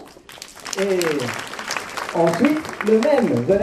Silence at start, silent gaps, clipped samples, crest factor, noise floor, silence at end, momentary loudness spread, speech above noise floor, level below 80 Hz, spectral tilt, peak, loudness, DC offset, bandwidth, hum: 0 s; none; under 0.1%; 18 dB; -40 dBFS; 0 s; 16 LU; 22 dB; -54 dBFS; -5 dB/octave; -2 dBFS; -20 LUFS; under 0.1%; 14 kHz; none